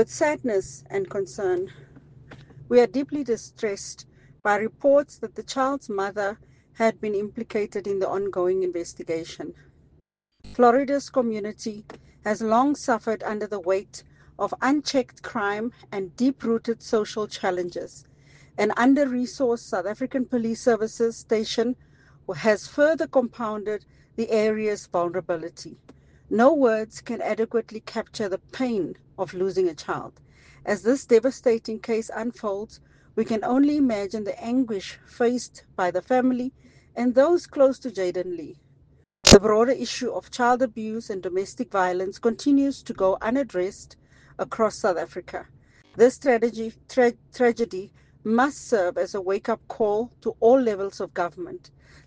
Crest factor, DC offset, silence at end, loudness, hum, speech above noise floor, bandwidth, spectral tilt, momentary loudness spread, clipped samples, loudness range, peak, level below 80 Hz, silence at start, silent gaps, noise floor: 24 dB; under 0.1%; 0.5 s; -24 LUFS; none; 40 dB; 10 kHz; -4.5 dB/octave; 14 LU; under 0.1%; 6 LU; 0 dBFS; -50 dBFS; 0 s; none; -63 dBFS